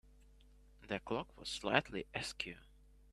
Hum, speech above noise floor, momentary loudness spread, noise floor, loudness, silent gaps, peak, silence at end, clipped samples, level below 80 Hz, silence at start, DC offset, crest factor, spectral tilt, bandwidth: none; 23 dB; 10 LU; -63 dBFS; -40 LUFS; none; -12 dBFS; 0.45 s; under 0.1%; -62 dBFS; 0.05 s; under 0.1%; 30 dB; -4 dB/octave; 14.5 kHz